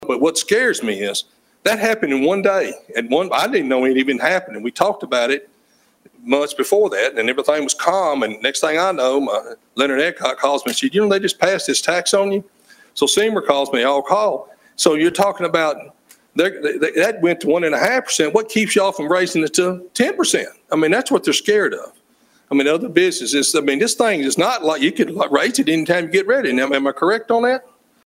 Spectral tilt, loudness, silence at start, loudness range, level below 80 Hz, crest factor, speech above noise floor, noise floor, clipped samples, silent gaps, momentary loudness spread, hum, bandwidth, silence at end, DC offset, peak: -3 dB/octave; -17 LUFS; 0 s; 2 LU; -64 dBFS; 18 dB; 40 dB; -58 dBFS; under 0.1%; none; 5 LU; none; 16 kHz; 0.45 s; under 0.1%; 0 dBFS